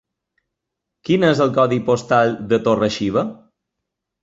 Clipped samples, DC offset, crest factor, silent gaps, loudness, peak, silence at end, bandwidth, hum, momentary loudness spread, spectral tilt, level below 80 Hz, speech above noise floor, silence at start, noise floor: under 0.1%; under 0.1%; 18 dB; none; -17 LUFS; -2 dBFS; 0.9 s; 8 kHz; none; 6 LU; -6 dB/octave; -54 dBFS; 64 dB; 1.1 s; -81 dBFS